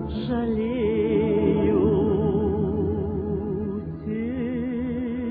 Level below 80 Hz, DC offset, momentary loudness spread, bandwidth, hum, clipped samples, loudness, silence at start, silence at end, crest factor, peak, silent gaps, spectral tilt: -40 dBFS; under 0.1%; 8 LU; 4.8 kHz; none; under 0.1%; -24 LUFS; 0 s; 0 s; 14 dB; -8 dBFS; none; -12 dB/octave